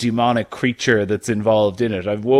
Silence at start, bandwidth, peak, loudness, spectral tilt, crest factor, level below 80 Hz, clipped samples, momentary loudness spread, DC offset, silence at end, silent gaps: 0 s; 13 kHz; -2 dBFS; -19 LUFS; -5.5 dB/octave; 16 dB; -54 dBFS; under 0.1%; 5 LU; under 0.1%; 0 s; none